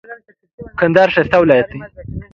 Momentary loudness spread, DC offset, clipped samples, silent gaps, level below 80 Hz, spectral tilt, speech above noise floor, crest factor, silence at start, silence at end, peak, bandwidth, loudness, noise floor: 19 LU; under 0.1%; under 0.1%; 0.53-0.58 s; -40 dBFS; -7.5 dB/octave; 25 dB; 16 dB; 0.1 s; 0.1 s; 0 dBFS; 7 kHz; -13 LUFS; -38 dBFS